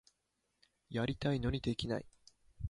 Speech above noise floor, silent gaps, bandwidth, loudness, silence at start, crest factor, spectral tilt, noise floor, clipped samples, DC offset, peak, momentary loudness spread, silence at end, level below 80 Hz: 47 dB; none; 11.5 kHz; -38 LUFS; 0.9 s; 20 dB; -6.5 dB/octave; -83 dBFS; under 0.1%; under 0.1%; -20 dBFS; 6 LU; 0 s; -52 dBFS